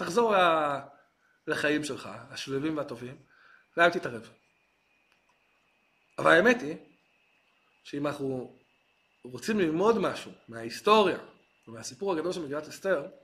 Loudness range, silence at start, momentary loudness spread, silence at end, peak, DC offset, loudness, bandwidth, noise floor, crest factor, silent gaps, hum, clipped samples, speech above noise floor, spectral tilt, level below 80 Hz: 5 LU; 0 s; 19 LU; 0.15 s; -6 dBFS; under 0.1%; -28 LUFS; 15 kHz; -70 dBFS; 24 dB; none; none; under 0.1%; 42 dB; -4.5 dB/octave; -70 dBFS